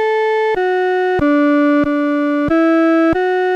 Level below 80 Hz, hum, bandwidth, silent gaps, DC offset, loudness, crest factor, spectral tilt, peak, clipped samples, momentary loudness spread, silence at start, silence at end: -42 dBFS; none; 7.4 kHz; none; under 0.1%; -14 LUFS; 8 dB; -7 dB/octave; -6 dBFS; under 0.1%; 3 LU; 0 s; 0 s